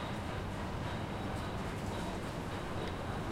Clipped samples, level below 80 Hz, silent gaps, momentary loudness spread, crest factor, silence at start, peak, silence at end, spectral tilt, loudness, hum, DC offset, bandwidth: under 0.1%; -48 dBFS; none; 1 LU; 12 dB; 0 s; -26 dBFS; 0 s; -6 dB/octave; -40 LUFS; none; under 0.1%; 16.5 kHz